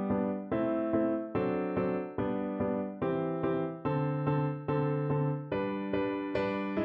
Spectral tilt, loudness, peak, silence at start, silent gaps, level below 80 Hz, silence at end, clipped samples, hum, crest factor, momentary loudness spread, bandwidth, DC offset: -10.5 dB/octave; -32 LUFS; -18 dBFS; 0 s; none; -60 dBFS; 0 s; under 0.1%; none; 14 dB; 3 LU; 5.6 kHz; under 0.1%